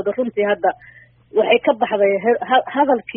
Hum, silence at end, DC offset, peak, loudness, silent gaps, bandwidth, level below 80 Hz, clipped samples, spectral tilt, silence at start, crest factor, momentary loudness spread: none; 0.05 s; under 0.1%; -2 dBFS; -18 LUFS; none; 3.7 kHz; -62 dBFS; under 0.1%; -2 dB/octave; 0 s; 16 dB; 6 LU